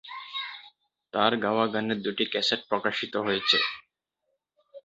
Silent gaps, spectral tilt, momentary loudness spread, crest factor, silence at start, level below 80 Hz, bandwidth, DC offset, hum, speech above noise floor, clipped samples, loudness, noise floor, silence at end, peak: none; -4 dB/octave; 12 LU; 24 dB; 0.05 s; -70 dBFS; 8 kHz; under 0.1%; none; 53 dB; under 0.1%; -27 LUFS; -80 dBFS; 0.05 s; -6 dBFS